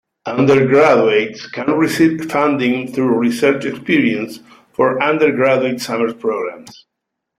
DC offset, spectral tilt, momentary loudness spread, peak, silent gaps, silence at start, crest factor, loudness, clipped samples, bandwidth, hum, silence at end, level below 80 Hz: under 0.1%; -6 dB/octave; 12 LU; 0 dBFS; none; 0.25 s; 14 dB; -15 LUFS; under 0.1%; 15 kHz; none; 0.7 s; -58 dBFS